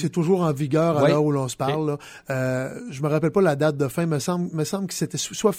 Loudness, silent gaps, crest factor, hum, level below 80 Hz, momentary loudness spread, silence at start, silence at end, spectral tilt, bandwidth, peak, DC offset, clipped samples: -23 LUFS; none; 16 dB; none; -58 dBFS; 9 LU; 0 s; 0 s; -6 dB/octave; 16 kHz; -6 dBFS; under 0.1%; under 0.1%